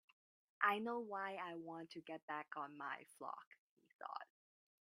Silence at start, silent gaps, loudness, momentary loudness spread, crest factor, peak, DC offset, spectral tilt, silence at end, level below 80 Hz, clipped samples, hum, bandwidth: 0.6 s; 2.22-2.28 s, 3.47-3.51 s, 3.60-3.77 s, 3.95-3.99 s; -46 LUFS; 14 LU; 28 dB; -20 dBFS; under 0.1%; -5 dB/octave; 0.6 s; under -90 dBFS; under 0.1%; none; 12 kHz